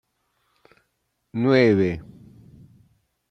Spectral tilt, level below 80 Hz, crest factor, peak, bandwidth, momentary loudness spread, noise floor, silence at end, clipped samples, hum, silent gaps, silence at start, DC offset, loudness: -8 dB/octave; -58 dBFS; 20 dB; -4 dBFS; 7.8 kHz; 17 LU; -74 dBFS; 1.3 s; under 0.1%; none; none; 1.35 s; under 0.1%; -20 LUFS